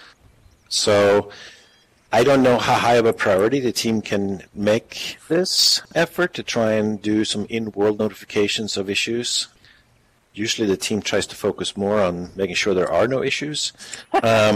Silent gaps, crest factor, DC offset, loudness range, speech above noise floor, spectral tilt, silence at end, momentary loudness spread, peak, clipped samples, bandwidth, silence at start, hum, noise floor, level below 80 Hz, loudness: none; 16 dB; under 0.1%; 5 LU; 39 dB; -3.5 dB/octave; 0 s; 9 LU; -4 dBFS; under 0.1%; 16 kHz; 0.7 s; none; -59 dBFS; -56 dBFS; -20 LUFS